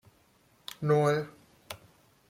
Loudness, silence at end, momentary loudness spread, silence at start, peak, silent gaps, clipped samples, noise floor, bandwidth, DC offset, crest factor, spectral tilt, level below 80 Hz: -28 LUFS; 0.55 s; 21 LU; 0.8 s; -14 dBFS; none; under 0.1%; -65 dBFS; 16.5 kHz; under 0.1%; 18 dB; -6.5 dB/octave; -70 dBFS